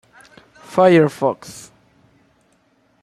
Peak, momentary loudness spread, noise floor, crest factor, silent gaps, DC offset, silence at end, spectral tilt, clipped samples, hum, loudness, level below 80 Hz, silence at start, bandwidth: -2 dBFS; 24 LU; -60 dBFS; 18 dB; none; under 0.1%; 1.4 s; -6.5 dB/octave; under 0.1%; none; -16 LUFS; -64 dBFS; 0.7 s; 14 kHz